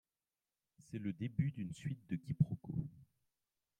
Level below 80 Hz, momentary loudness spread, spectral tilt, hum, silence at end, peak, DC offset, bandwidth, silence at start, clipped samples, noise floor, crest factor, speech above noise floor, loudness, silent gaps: -70 dBFS; 9 LU; -8.5 dB/octave; none; 0.75 s; -20 dBFS; under 0.1%; 9.8 kHz; 0.9 s; under 0.1%; under -90 dBFS; 24 dB; over 50 dB; -41 LUFS; none